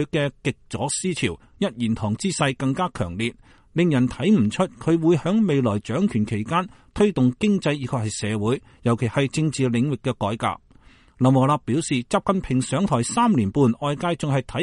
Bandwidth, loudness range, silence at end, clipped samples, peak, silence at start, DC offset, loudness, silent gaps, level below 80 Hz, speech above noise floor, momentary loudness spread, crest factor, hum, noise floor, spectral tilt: 11.5 kHz; 3 LU; 0 s; under 0.1%; -6 dBFS; 0 s; under 0.1%; -22 LUFS; none; -48 dBFS; 30 dB; 7 LU; 16 dB; none; -52 dBFS; -6 dB/octave